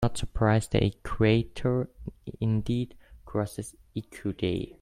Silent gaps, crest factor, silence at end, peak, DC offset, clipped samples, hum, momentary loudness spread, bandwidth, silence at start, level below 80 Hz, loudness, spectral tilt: none; 20 dB; 0.1 s; -8 dBFS; under 0.1%; under 0.1%; none; 15 LU; 13.5 kHz; 0 s; -44 dBFS; -29 LUFS; -6.5 dB/octave